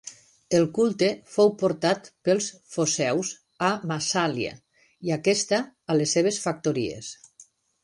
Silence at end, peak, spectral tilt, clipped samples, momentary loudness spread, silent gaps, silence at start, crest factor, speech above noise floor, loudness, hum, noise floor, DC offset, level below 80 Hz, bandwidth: 0.4 s; -8 dBFS; -4 dB/octave; under 0.1%; 11 LU; none; 0.05 s; 18 dB; 31 dB; -25 LUFS; none; -56 dBFS; under 0.1%; -66 dBFS; 11.5 kHz